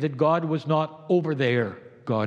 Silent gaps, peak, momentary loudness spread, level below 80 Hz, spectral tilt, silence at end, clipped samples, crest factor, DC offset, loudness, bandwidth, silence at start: none; -10 dBFS; 7 LU; -76 dBFS; -8.5 dB/octave; 0 s; under 0.1%; 16 dB; under 0.1%; -25 LUFS; 7.2 kHz; 0 s